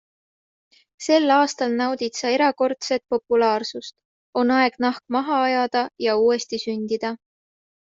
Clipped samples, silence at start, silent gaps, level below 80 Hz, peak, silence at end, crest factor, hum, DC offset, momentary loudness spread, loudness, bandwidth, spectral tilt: under 0.1%; 1 s; 4.05-4.33 s; -68 dBFS; -4 dBFS; 0.65 s; 18 dB; none; under 0.1%; 10 LU; -21 LUFS; 7.8 kHz; -3 dB/octave